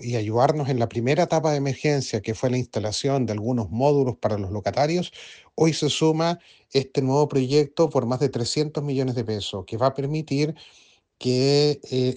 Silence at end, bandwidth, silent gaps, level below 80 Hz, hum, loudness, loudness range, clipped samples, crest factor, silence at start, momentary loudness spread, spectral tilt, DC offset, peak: 0 s; 9.8 kHz; none; -58 dBFS; none; -23 LUFS; 2 LU; under 0.1%; 18 dB; 0 s; 7 LU; -6 dB/octave; under 0.1%; -6 dBFS